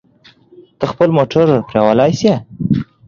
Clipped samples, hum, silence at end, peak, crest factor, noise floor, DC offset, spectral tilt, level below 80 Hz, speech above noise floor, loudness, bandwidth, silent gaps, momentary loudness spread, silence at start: under 0.1%; none; 0.25 s; 0 dBFS; 14 dB; -48 dBFS; under 0.1%; -7 dB/octave; -46 dBFS; 35 dB; -14 LUFS; 7.4 kHz; none; 7 LU; 0.8 s